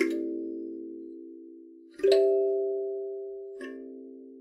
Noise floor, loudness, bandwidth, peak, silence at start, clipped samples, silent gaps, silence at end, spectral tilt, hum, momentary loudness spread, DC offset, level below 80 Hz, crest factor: -50 dBFS; -29 LUFS; 11.5 kHz; -10 dBFS; 0 s; under 0.1%; none; 0 s; -4 dB/octave; none; 23 LU; under 0.1%; -76 dBFS; 22 dB